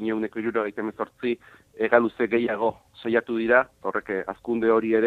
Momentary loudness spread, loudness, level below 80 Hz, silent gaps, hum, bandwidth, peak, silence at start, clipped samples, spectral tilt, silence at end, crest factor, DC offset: 9 LU; -25 LUFS; -62 dBFS; none; none; 4.6 kHz; -4 dBFS; 0 s; under 0.1%; -7.5 dB/octave; 0 s; 20 dB; under 0.1%